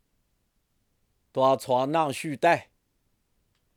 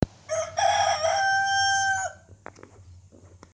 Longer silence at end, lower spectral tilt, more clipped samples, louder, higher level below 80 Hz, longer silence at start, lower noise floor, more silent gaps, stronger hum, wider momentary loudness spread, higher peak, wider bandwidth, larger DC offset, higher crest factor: first, 1.15 s vs 0.3 s; first, -5 dB/octave vs -2 dB/octave; neither; about the same, -25 LUFS vs -24 LUFS; second, -74 dBFS vs -52 dBFS; first, 1.35 s vs 0 s; first, -73 dBFS vs -51 dBFS; neither; neither; about the same, 5 LU vs 7 LU; about the same, -8 dBFS vs -10 dBFS; first, 15.5 kHz vs 10.5 kHz; neither; about the same, 20 dB vs 16 dB